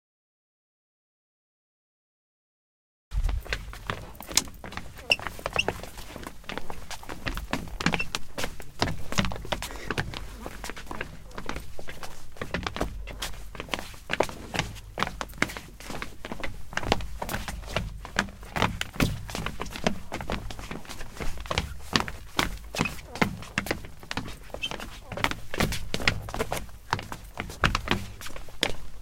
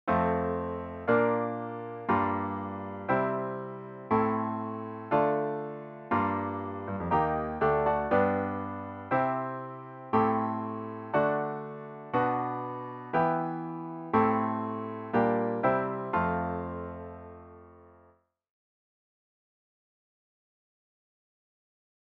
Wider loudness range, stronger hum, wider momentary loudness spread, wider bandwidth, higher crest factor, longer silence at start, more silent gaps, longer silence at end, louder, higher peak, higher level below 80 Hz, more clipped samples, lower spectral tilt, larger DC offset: first, 6 LU vs 3 LU; neither; about the same, 13 LU vs 13 LU; first, 17 kHz vs 5.4 kHz; first, 32 dB vs 20 dB; first, 3.1 s vs 0.05 s; neither; second, 0 s vs 4.2 s; about the same, -32 LUFS vs -30 LUFS; first, 0 dBFS vs -12 dBFS; first, -40 dBFS vs -58 dBFS; neither; second, -3.5 dB/octave vs -10 dB/octave; neither